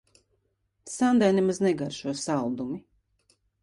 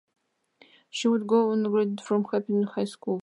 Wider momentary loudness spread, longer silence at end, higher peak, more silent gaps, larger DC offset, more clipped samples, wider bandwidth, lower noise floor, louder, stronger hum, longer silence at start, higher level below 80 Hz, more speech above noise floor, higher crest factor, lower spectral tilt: first, 14 LU vs 7 LU; first, 0.8 s vs 0 s; about the same, -10 dBFS vs -10 dBFS; neither; neither; neither; about the same, 11.5 kHz vs 11.5 kHz; first, -74 dBFS vs -61 dBFS; about the same, -26 LUFS vs -26 LUFS; neither; about the same, 0.85 s vs 0.95 s; first, -66 dBFS vs -82 dBFS; first, 49 dB vs 36 dB; about the same, 18 dB vs 18 dB; about the same, -5.5 dB/octave vs -6 dB/octave